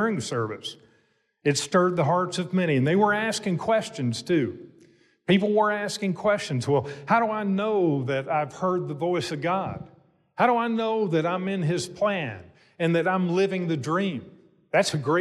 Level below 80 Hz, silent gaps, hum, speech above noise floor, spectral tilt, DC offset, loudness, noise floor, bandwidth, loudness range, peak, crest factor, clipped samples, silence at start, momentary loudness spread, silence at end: -66 dBFS; none; none; 43 dB; -5.5 dB/octave; under 0.1%; -25 LUFS; -67 dBFS; 12.5 kHz; 2 LU; -10 dBFS; 16 dB; under 0.1%; 0 s; 8 LU; 0 s